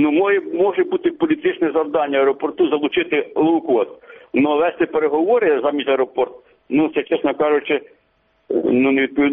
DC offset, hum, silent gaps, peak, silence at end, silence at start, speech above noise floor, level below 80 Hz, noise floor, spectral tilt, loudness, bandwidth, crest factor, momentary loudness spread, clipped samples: under 0.1%; none; none; -6 dBFS; 0 s; 0 s; 45 dB; -60 dBFS; -62 dBFS; -3.5 dB/octave; -18 LUFS; 3.9 kHz; 12 dB; 5 LU; under 0.1%